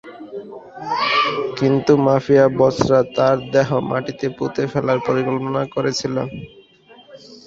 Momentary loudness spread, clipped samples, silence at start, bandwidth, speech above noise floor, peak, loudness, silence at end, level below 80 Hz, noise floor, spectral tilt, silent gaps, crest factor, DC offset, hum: 17 LU; under 0.1%; 0.05 s; 7.8 kHz; 30 dB; -2 dBFS; -18 LUFS; 0.1 s; -52 dBFS; -47 dBFS; -6 dB/octave; none; 18 dB; under 0.1%; none